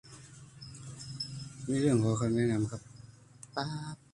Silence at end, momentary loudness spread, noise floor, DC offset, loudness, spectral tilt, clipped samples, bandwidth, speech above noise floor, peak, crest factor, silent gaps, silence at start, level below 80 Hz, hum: 0.15 s; 23 LU; -54 dBFS; under 0.1%; -32 LUFS; -6 dB/octave; under 0.1%; 11.5 kHz; 24 dB; -16 dBFS; 18 dB; none; 0.05 s; -62 dBFS; none